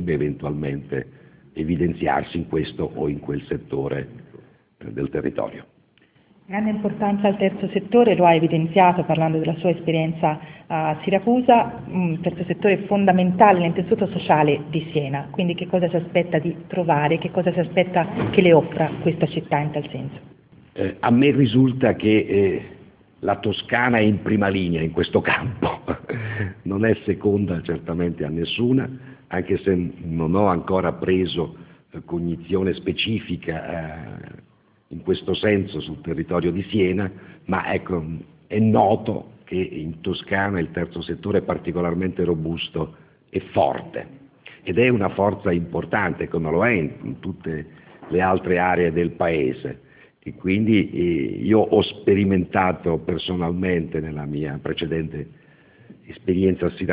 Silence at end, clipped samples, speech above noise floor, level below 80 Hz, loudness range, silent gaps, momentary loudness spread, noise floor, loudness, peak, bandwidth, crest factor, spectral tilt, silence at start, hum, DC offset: 0 s; under 0.1%; 37 dB; -46 dBFS; 7 LU; none; 13 LU; -58 dBFS; -22 LUFS; 0 dBFS; 4 kHz; 22 dB; -11 dB/octave; 0 s; none; under 0.1%